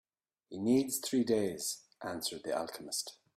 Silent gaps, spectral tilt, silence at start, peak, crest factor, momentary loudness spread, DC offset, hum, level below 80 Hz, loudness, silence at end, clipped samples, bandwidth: none; -3.5 dB/octave; 0.5 s; -18 dBFS; 18 dB; 9 LU; under 0.1%; none; -74 dBFS; -35 LUFS; 0.25 s; under 0.1%; 16 kHz